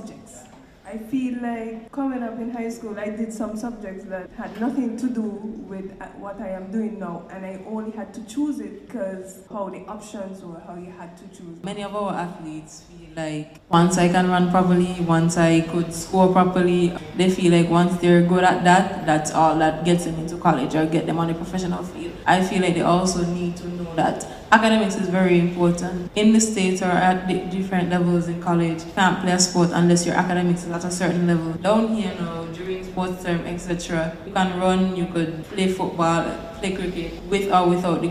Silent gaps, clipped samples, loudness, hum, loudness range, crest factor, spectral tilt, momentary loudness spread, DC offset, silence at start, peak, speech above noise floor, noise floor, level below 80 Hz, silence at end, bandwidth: none; under 0.1%; -21 LUFS; none; 13 LU; 22 dB; -5.5 dB/octave; 17 LU; under 0.1%; 0 s; 0 dBFS; 24 dB; -46 dBFS; -48 dBFS; 0 s; 12.5 kHz